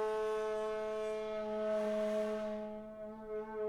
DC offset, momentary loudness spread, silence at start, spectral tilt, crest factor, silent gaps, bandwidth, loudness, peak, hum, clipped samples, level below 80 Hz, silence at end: under 0.1%; 10 LU; 0 s; -5.5 dB/octave; 12 dB; none; 13 kHz; -39 LUFS; -26 dBFS; none; under 0.1%; -66 dBFS; 0 s